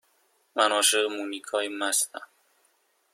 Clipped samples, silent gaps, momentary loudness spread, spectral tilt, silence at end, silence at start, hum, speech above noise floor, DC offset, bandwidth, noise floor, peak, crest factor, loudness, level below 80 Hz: under 0.1%; none; 13 LU; 1 dB/octave; 0.9 s; 0.55 s; none; 42 dB; under 0.1%; 16.5 kHz; -69 dBFS; -6 dBFS; 24 dB; -25 LUFS; -80 dBFS